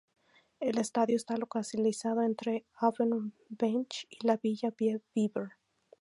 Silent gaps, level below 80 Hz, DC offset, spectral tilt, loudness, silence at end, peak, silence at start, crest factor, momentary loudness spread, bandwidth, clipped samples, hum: none; -82 dBFS; under 0.1%; -5.5 dB/octave; -32 LUFS; 0.5 s; -14 dBFS; 0.6 s; 20 dB; 6 LU; 11.5 kHz; under 0.1%; none